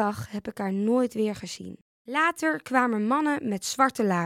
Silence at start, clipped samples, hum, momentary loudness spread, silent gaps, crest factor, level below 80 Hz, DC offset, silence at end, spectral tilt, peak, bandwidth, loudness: 0 s; under 0.1%; none; 12 LU; 1.81-2.05 s; 20 dB; -64 dBFS; under 0.1%; 0 s; -5 dB/octave; -6 dBFS; 16 kHz; -26 LUFS